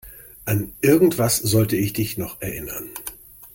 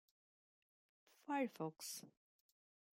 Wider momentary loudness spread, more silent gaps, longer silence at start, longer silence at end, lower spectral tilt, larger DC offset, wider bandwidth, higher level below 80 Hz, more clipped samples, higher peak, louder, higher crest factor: first, 17 LU vs 10 LU; neither; second, 0.05 s vs 1.25 s; second, 0.1 s vs 0.85 s; about the same, -5 dB/octave vs -4 dB/octave; neither; about the same, 17 kHz vs 16.5 kHz; first, -48 dBFS vs under -90 dBFS; neither; first, -4 dBFS vs -30 dBFS; first, -21 LUFS vs -46 LUFS; about the same, 18 dB vs 22 dB